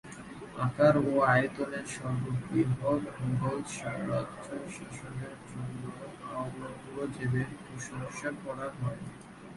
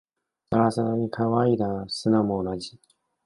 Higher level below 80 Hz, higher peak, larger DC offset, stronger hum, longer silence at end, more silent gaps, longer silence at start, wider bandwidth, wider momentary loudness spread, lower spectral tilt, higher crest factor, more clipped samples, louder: about the same, -60 dBFS vs -56 dBFS; second, -12 dBFS vs -6 dBFS; neither; neither; second, 0 s vs 0.5 s; neither; second, 0.05 s vs 0.5 s; about the same, 11.5 kHz vs 11.5 kHz; first, 17 LU vs 8 LU; about the same, -6.5 dB/octave vs -7 dB/octave; about the same, 20 dB vs 20 dB; neither; second, -33 LUFS vs -25 LUFS